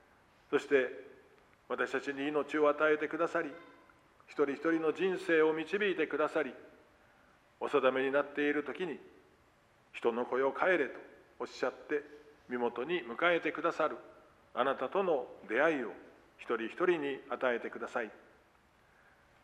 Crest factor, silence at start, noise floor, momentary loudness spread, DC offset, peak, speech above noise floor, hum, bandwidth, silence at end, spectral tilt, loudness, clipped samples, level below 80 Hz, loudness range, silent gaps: 20 dB; 0.5 s; -67 dBFS; 13 LU; under 0.1%; -14 dBFS; 34 dB; none; 10.5 kHz; 1.25 s; -5.5 dB/octave; -34 LUFS; under 0.1%; -78 dBFS; 3 LU; none